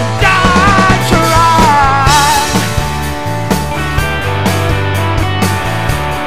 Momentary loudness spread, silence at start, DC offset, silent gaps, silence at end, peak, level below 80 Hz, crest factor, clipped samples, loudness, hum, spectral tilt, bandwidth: 7 LU; 0 s; 5%; none; 0 s; 0 dBFS; -22 dBFS; 12 dB; 0.4%; -11 LUFS; none; -4.5 dB/octave; 16.5 kHz